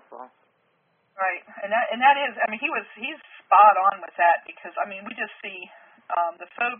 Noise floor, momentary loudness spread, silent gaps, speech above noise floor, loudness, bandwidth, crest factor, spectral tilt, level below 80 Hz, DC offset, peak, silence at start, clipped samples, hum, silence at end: -68 dBFS; 19 LU; none; 45 dB; -22 LUFS; 3.6 kHz; 20 dB; 1 dB/octave; -86 dBFS; under 0.1%; -4 dBFS; 0.1 s; under 0.1%; none; 0 s